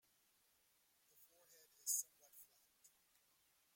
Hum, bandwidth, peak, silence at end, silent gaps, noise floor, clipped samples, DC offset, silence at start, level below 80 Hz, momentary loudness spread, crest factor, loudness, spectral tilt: none; 16.5 kHz; -26 dBFS; 1.3 s; none; -79 dBFS; under 0.1%; under 0.1%; 1.85 s; under -90 dBFS; 26 LU; 28 dB; -44 LUFS; 3.5 dB/octave